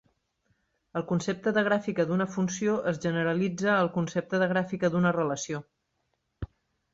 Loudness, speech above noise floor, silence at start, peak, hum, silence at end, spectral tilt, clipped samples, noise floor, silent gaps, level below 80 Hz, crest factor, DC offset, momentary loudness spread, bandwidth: -28 LUFS; 50 dB; 0.95 s; -12 dBFS; none; 0.5 s; -6 dB/octave; under 0.1%; -77 dBFS; none; -58 dBFS; 16 dB; under 0.1%; 11 LU; 7.8 kHz